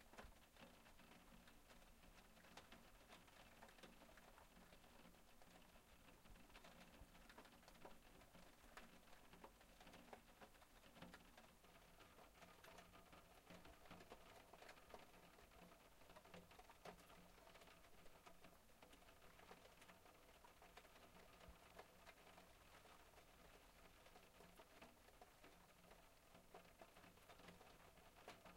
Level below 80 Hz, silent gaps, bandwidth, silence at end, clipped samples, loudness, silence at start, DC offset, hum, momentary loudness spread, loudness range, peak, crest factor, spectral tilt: -76 dBFS; none; 16 kHz; 0 s; under 0.1%; -67 LUFS; 0 s; under 0.1%; none; 4 LU; 2 LU; -44 dBFS; 24 dB; -3.5 dB/octave